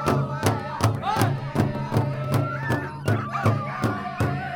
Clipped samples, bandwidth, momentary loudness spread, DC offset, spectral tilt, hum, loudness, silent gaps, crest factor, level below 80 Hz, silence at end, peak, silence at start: under 0.1%; 19 kHz; 3 LU; under 0.1%; -6.5 dB/octave; none; -25 LUFS; none; 22 dB; -50 dBFS; 0 s; -2 dBFS; 0 s